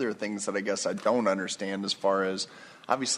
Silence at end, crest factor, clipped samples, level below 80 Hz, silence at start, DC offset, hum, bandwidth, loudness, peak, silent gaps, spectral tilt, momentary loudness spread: 0 s; 22 dB; under 0.1%; -78 dBFS; 0 s; under 0.1%; none; 12.5 kHz; -29 LUFS; -8 dBFS; none; -3 dB/octave; 7 LU